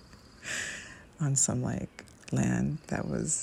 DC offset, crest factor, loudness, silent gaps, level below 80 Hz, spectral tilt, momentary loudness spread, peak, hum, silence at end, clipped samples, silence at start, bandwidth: under 0.1%; 18 dB; -31 LUFS; none; -54 dBFS; -4.5 dB/octave; 17 LU; -14 dBFS; none; 0 s; under 0.1%; 0 s; 16 kHz